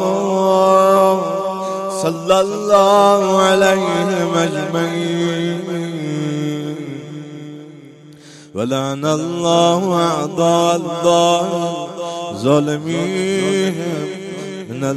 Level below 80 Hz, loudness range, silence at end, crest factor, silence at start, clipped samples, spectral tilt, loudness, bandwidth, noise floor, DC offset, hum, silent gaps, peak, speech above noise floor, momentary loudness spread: -58 dBFS; 9 LU; 0 s; 16 dB; 0 s; under 0.1%; -5 dB/octave; -16 LUFS; 14 kHz; -40 dBFS; under 0.1%; none; none; 0 dBFS; 25 dB; 14 LU